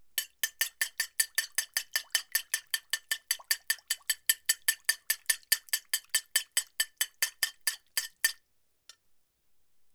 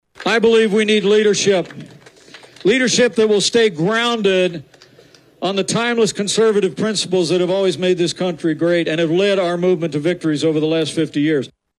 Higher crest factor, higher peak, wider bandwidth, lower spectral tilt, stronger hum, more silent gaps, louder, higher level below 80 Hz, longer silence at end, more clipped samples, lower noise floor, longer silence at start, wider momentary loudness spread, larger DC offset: first, 26 dB vs 14 dB; second, -8 dBFS vs -4 dBFS; first, over 20 kHz vs 12 kHz; second, 6 dB/octave vs -4 dB/octave; neither; neither; second, -30 LUFS vs -16 LUFS; second, -82 dBFS vs -60 dBFS; first, 1.6 s vs 0.3 s; neither; first, -72 dBFS vs -48 dBFS; about the same, 0.15 s vs 0.2 s; about the same, 5 LU vs 6 LU; neither